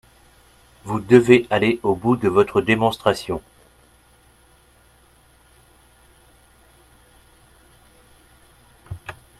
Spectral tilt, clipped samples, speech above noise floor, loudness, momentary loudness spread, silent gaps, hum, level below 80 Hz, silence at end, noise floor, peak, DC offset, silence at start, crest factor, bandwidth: -6.5 dB/octave; under 0.1%; 37 dB; -18 LUFS; 22 LU; none; none; -52 dBFS; 0.3 s; -54 dBFS; 0 dBFS; under 0.1%; 0.85 s; 22 dB; 13 kHz